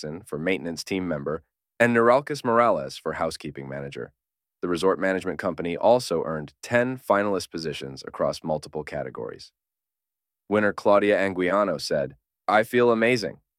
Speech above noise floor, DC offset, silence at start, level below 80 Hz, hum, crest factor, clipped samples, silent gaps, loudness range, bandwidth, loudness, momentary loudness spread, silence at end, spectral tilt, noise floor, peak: 65 dB; under 0.1%; 0 s; -58 dBFS; none; 20 dB; under 0.1%; none; 6 LU; 15.5 kHz; -24 LUFS; 15 LU; 0.25 s; -5.5 dB/octave; -89 dBFS; -4 dBFS